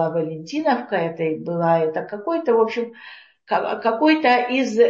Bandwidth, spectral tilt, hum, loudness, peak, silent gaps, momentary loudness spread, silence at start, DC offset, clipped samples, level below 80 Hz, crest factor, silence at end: 7.6 kHz; -6 dB/octave; none; -21 LUFS; -2 dBFS; none; 10 LU; 0 s; under 0.1%; under 0.1%; -72 dBFS; 18 dB; 0 s